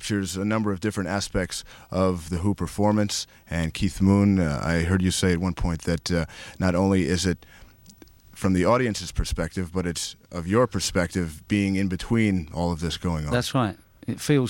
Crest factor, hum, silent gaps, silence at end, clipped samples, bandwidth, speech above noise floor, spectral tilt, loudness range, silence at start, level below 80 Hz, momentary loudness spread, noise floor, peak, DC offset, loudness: 16 dB; none; none; 0 s; under 0.1%; 16.5 kHz; 27 dB; -5.5 dB/octave; 3 LU; 0 s; -40 dBFS; 8 LU; -51 dBFS; -8 dBFS; under 0.1%; -25 LUFS